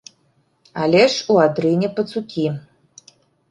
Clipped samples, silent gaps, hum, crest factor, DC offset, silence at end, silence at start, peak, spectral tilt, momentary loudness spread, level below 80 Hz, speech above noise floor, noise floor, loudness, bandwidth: under 0.1%; none; none; 18 dB; under 0.1%; 0.9 s; 0.75 s; -2 dBFS; -5.5 dB/octave; 10 LU; -62 dBFS; 45 dB; -62 dBFS; -18 LUFS; 11.5 kHz